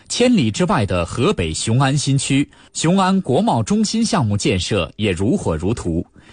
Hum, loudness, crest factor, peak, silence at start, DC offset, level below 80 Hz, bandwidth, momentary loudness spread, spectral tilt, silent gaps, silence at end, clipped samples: none; -18 LUFS; 12 dB; -4 dBFS; 0.1 s; under 0.1%; -40 dBFS; 10 kHz; 5 LU; -5 dB/octave; none; 0.3 s; under 0.1%